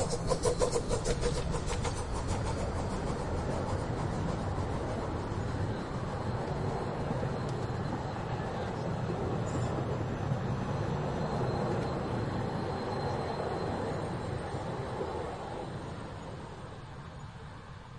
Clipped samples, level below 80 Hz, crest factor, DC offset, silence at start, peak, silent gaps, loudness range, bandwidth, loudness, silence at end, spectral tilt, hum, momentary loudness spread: under 0.1%; -44 dBFS; 20 dB; under 0.1%; 0 s; -14 dBFS; none; 4 LU; 11.5 kHz; -35 LUFS; 0 s; -6 dB/octave; none; 9 LU